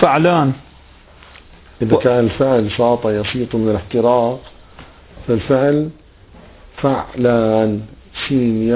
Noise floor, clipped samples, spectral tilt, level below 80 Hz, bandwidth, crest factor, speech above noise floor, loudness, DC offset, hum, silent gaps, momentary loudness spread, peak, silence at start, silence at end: -44 dBFS; under 0.1%; -11 dB/octave; -42 dBFS; 4 kHz; 16 dB; 29 dB; -16 LUFS; under 0.1%; none; none; 12 LU; 0 dBFS; 0 s; 0 s